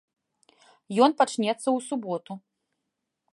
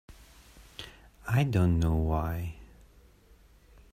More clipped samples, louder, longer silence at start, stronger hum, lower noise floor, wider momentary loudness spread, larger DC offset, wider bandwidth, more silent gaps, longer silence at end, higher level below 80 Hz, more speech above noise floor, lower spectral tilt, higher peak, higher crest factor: neither; first, -25 LUFS vs -29 LUFS; first, 0.9 s vs 0.1 s; neither; first, -82 dBFS vs -58 dBFS; second, 16 LU vs 22 LU; neither; second, 11.5 kHz vs 15.5 kHz; neither; second, 0.95 s vs 1.3 s; second, -84 dBFS vs -42 dBFS; first, 58 dB vs 32 dB; second, -4.5 dB/octave vs -7.5 dB/octave; first, -6 dBFS vs -14 dBFS; about the same, 22 dB vs 18 dB